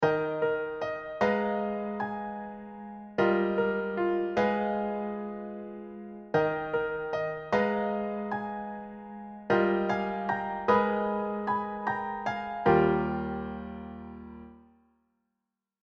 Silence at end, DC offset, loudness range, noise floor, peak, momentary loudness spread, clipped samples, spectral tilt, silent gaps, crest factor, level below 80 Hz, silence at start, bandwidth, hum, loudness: 1.25 s; under 0.1%; 3 LU; -86 dBFS; -10 dBFS; 17 LU; under 0.1%; -7.5 dB/octave; none; 20 dB; -58 dBFS; 0 s; 7 kHz; none; -30 LUFS